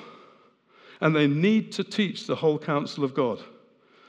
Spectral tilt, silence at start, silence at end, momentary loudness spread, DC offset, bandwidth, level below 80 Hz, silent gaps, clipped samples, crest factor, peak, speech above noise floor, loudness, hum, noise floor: -6.5 dB/octave; 0 s; 0.65 s; 7 LU; under 0.1%; 9.8 kHz; -86 dBFS; none; under 0.1%; 20 dB; -8 dBFS; 34 dB; -25 LUFS; none; -58 dBFS